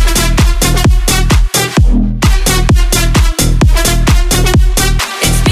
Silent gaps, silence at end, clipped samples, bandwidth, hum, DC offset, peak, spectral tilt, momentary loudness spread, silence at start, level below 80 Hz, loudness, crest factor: none; 0 s; under 0.1%; 16 kHz; none; under 0.1%; 0 dBFS; -4 dB/octave; 2 LU; 0 s; -10 dBFS; -10 LUFS; 8 dB